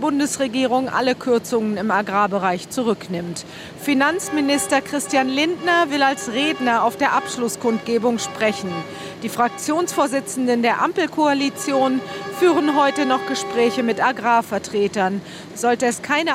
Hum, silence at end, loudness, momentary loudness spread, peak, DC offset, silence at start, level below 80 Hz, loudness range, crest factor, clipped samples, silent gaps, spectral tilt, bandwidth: none; 0 s; -20 LUFS; 7 LU; -2 dBFS; under 0.1%; 0 s; -62 dBFS; 2 LU; 18 dB; under 0.1%; none; -3.5 dB/octave; 16 kHz